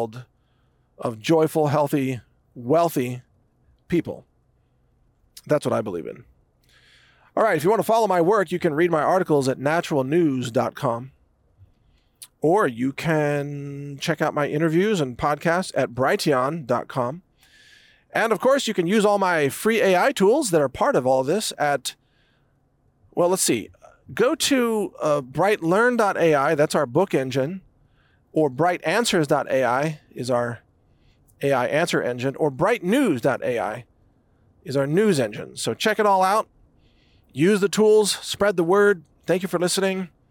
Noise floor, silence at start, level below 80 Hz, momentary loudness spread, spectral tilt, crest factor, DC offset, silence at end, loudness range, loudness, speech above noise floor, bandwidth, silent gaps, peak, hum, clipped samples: -63 dBFS; 0 s; -60 dBFS; 11 LU; -5 dB/octave; 14 dB; under 0.1%; 0.25 s; 5 LU; -22 LUFS; 42 dB; 18 kHz; none; -8 dBFS; none; under 0.1%